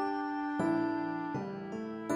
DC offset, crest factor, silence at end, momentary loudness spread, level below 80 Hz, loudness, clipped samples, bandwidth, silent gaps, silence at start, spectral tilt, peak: under 0.1%; 14 dB; 0 s; 9 LU; -72 dBFS; -35 LUFS; under 0.1%; 12.5 kHz; none; 0 s; -7 dB/octave; -20 dBFS